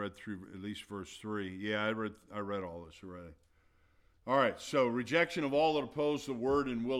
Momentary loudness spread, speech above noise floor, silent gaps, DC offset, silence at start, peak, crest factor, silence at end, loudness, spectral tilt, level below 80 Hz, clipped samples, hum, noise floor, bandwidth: 16 LU; 34 dB; none; under 0.1%; 0 s; -16 dBFS; 20 dB; 0 s; -34 LUFS; -5.5 dB/octave; -64 dBFS; under 0.1%; none; -69 dBFS; 14.5 kHz